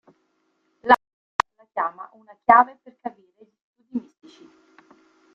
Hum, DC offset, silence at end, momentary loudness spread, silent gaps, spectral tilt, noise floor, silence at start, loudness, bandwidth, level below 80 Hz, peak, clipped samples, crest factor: none; under 0.1%; 1.35 s; 21 LU; 1.13-1.39 s, 3.61-3.74 s; -4 dB/octave; -70 dBFS; 0.85 s; -22 LUFS; 8.8 kHz; -64 dBFS; 0 dBFS; under 0.1%; 26 dB